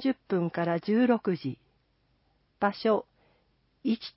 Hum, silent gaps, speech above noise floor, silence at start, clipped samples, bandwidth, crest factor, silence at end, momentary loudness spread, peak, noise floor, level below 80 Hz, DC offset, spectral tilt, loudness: none; none; 43 dB; 0 s; under 0.1%; 5.8 kHz; 18 dB; 0.05 s; 10 LU; -10 dBFS; -70 dBFS; -70 dBFS; under 0.1%; -10.5 dB/octave; -29 LUFS